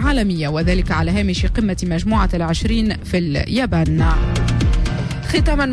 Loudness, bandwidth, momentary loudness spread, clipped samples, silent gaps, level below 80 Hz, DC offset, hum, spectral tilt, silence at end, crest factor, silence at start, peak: -18 LUFS; 11 kHz; 3 LU; under 0.1%; none; -22 dBFS; under 0.1%; none; -6.5 dB/octave; 0 s; 10 dB; 0 s; -6 dBFS